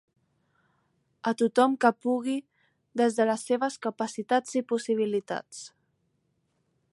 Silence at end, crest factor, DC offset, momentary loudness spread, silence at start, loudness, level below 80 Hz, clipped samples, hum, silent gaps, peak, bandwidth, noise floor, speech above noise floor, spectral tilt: 1.25 s; 22 dB; under 0.1%; 13 LU; 1.25 s; -27 LUFS; -82 dBFS; under 0.1%; none; none; -8 dBFS; 11.5 kHz; -74 dBFS; 48 dB; -4.5 dB/octave